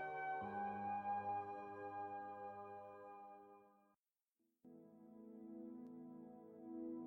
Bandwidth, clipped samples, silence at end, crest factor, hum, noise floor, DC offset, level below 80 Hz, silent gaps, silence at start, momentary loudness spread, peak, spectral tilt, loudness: 16 kHz; under 0.1%; 0 s; 14 dB; none; under -90 dBFS; under 0.1%; -88 dBFS; 3.99-4.03 s; 0 s; 19 LU; -36 dBFS; -8 dB/octave; -50 LUFS